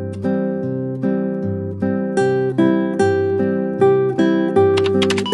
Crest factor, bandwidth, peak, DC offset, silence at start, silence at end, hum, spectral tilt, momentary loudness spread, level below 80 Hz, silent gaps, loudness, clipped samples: 14 dB; 11.5 kHz; -4 dBFS; under 0.1%; 0 s; 0 s; none; -7 dB/octave; 7 LU; -62 dBFS; none; -18 LUFS; under 0.1%